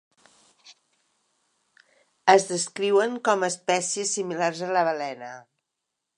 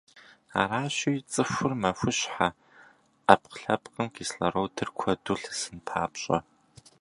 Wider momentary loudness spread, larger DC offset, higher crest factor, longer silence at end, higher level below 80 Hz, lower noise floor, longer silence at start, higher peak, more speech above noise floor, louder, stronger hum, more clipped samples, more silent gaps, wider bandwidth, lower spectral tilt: first, 13 LU vs 10 LU; neither; about the same, 24 dB vs 28 dB; first, 0.75 s vs 0.6 s; second, -82 dBFS vs -58 dBFS; first, -83 dBFS vs -58 dBFS; first, 0.65 s vs 0.15 s; about the same, -2 dBFS vs 0 dBFS; first, 59 dB vs 30 dB; first, -24 LUFS vs -28 LUFS; neither; neither; neither; about the same, 11 kHz vs 11.5 kHz; second, -2.5 dB/octave vs -4 dB/octave